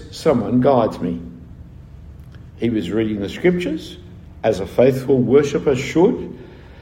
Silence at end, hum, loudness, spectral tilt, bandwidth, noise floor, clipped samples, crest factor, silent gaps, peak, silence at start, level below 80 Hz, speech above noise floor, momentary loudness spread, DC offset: 0 s; none; -18 LUFS; -7 dB/octave; 16 kHz; -38 dBFS; under 0.1%; 18 dB; none; -2 dBFS; 0 s; -44 dBFS; 21 dB; 18 LU; under 0.1%